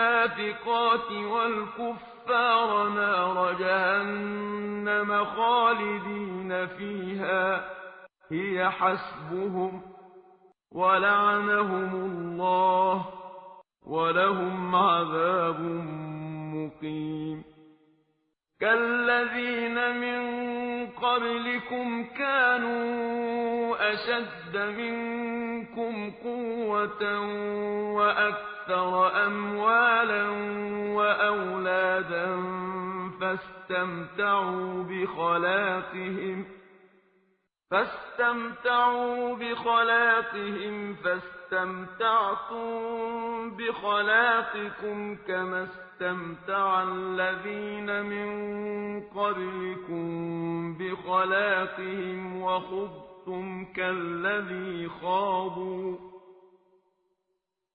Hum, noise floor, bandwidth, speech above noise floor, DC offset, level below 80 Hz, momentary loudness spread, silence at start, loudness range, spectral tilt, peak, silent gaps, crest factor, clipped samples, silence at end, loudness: none; -81 dBFS; 5 kHz; 53 dB; under 0.1%; -68 dBFS; 12 LU; 0 s; 6 LU; -9 dB/octave; -10 dBFS; none; 18 dB; under 0.1%; 1.4 s; -28 LUFS